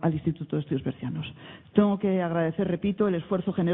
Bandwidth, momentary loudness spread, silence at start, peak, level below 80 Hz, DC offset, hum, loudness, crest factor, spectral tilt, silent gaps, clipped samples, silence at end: 3.9 kHz; 10 LU; 0 s; -6 dBFS; -58 dBFS; under 0.1%; none; -27 LUFS; 20 dB; -12 dB/octave; none; under 0.1%; 0 s